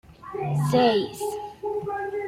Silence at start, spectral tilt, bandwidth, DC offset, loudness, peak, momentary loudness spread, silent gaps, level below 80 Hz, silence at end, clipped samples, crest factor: 0.1 s; -6 dB/octave; 15.5 kHz; under 0.1%; -25 LUFS; -10 dBFS; 12 LU; none; -60 dBFS; 0 s; under 0.1%; 16 dB